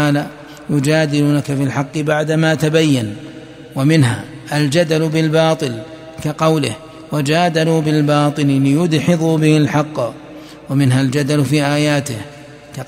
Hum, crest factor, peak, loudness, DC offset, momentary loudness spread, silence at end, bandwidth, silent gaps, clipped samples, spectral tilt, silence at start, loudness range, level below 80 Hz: none; 14 dB; 0 dBFS; -15 LUFS; under 0.1%; 15 LU; 0 s; 16 kHz; none; under 0.1%; -6 dB/octave; 0 s; 2 LU; -52 dBFS